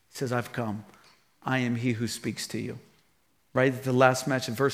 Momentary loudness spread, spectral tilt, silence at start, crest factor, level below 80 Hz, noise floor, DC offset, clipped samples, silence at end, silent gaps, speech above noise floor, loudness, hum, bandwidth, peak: 15 LU; -5.5 dB/octave; 0.15 s; 24 dB; -72 dBFS; -70 dBFS; under 0.1%; under 0.1%; 0 s; none; 42 dB; -28 LUFS; none; 16 kHz; -4 dBFS